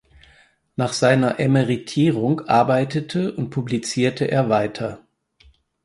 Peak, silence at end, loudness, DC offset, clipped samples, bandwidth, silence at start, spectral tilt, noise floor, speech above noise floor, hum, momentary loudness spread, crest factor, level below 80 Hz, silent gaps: -2 dBFS; 0.85 s; -20 LUFS; under 0.1%; under 0.1%; 11.5 kHz; 0.8 s; -6 dB/octave; -55 dBFS; 36 dB; none; 9 LU; 18 dB; -58 dBFS; none